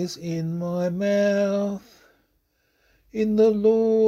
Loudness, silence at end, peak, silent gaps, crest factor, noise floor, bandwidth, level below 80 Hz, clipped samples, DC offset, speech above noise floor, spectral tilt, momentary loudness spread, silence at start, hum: -23 LUFS; 0 s; -8 dBFS; none; 14 dB; -69 dBFS; 13 kHz; -60 dBFS; under 0.1%; under 0.1%; 47 dB; -7 dB/octave; 11 LU; 0 s; none